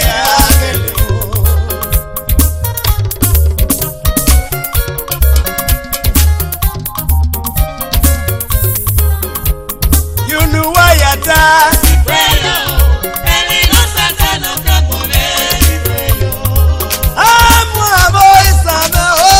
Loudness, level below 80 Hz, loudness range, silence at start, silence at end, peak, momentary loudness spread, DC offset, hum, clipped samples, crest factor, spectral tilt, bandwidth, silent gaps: -10 LUFS; -14 dBFS; 5 LU; 0 s; 0 s; 0 dBFS; 9 LU; under 0.1%; none; 0.9%; 10 dB; -3.5 dB/octave; 17 kHz; none